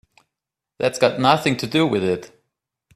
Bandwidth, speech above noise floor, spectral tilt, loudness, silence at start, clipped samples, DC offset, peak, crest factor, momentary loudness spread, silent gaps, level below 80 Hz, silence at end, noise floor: 15 kHz; 66 dB; -5 dB/octave; -20 LUFS; 0.8 s; under 0.1%; under 0.1%; 0 dBFS; 22 dB; 7 LU; none; -60 dBFS; 0.7 s; -85 dBFS